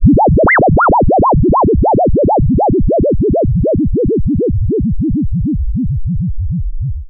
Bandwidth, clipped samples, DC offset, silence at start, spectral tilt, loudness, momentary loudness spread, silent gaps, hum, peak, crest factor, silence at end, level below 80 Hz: 2.2 kHz; under 0.1%; under 0.1%; 0 s; -5 dB/octave; -13 LUFS; 9 LU; none; none; 0 dBFS; 10 dB; 0 s; -20 dBFS